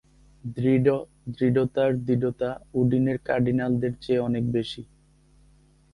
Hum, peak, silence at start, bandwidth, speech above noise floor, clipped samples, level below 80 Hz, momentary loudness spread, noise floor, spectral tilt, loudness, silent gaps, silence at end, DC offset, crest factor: none; -8 dBFS; 0.45 s; 11 kHz; 34 dB; under 0.1%; -54 dBFS; 10 LU; -58 dBFS; -9 dB/octave; -25 LUFS; none; 1.1 s; under 0.1%; 18 dB